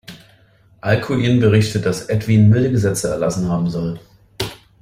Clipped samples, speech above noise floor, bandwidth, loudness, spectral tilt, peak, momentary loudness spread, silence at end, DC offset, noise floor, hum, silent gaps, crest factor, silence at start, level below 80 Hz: under 0.1%; 36 dB; 15 kHz; -17 LUFS; -6.5 dB/octave; -2 dBFS; 14 LU; 0.3 s; under 0.1%; -52 dBFS; none; none; 16 dB; 0.1 s; -44 dBFS